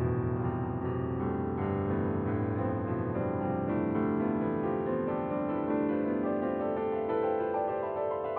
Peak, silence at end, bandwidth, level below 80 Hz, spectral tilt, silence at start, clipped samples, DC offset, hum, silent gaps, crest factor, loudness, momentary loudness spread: -18 dBFS; 0 s; 4.3 kHz; -54 dBFS; -9 dB/octave; 0 s; under 0.1%; under 0.1%; none; none; 12 dB; -32 LUFS; 3 LU